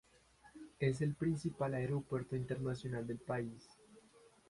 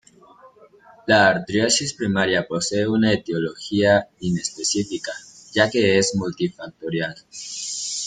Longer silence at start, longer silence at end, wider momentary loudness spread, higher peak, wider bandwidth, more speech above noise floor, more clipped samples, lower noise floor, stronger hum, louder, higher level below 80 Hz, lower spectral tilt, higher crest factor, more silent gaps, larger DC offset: about the same, 0.45 s vs 0.45 s; first, 0.5 s vs 0 s; about the same, 10 LU vs 12 LU; second, -22 dBFS vs -2 dBFS; first, 11.5 kHz vs 9.6 kHz; about the same, 27 dB vs 29 dB; neither; first, -66 dBFS vs -50 dBFS; neither; second, -40 LUFS vs -21 LUFS; second, -66 dBFS vs -56 dBFS; first, -7.5 dB/octave vs -3.5 dB/octave; about the same, 20 dB vs 20 dB; neither; neither